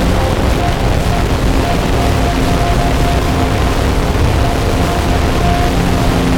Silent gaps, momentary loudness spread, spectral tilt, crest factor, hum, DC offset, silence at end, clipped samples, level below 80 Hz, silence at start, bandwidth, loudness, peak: none; 1 LU; -6 dB/octave; 12 dB; none; under 0.1%; 0 s; under 0.1%; -16 dBFS; 0 s; 18 kHz; -14 LUFS; 0 dBFS